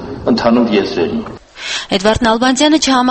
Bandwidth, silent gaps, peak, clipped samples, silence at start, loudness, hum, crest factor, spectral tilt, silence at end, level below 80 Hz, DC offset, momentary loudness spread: 8.8 kHz; none; 0 dBFS; under 0.1%; 0 s; -13 LUFS; none; 14 dB; -4 dB/octave; 0 s; -38 dBFS; under 0.1%; 11 LU